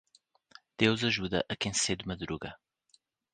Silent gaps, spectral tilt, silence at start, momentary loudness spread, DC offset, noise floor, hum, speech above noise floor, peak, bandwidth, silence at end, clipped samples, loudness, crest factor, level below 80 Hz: none; -3.5 dB/octave; 0.8 s; 13 LU; under 0.1%; -70 dBFS; none; 38 dB; -8 dBFS; 10 kHz; 0.8 s; under 0.1%; -31 LUFS; 26 dB; -58 dBFS